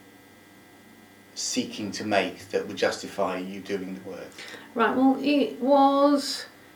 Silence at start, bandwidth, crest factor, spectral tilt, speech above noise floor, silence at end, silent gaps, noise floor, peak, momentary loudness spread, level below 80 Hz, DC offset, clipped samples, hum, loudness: 1.35 s; 19.5 kHz; 18 dB; -4 dB/octave; 27 dB; 0.25 s; none; -52 dBFS; -8 dBFS; 18 LU; -72 dBFS; under 0.1%; under 0.1%; none; -25 LUFS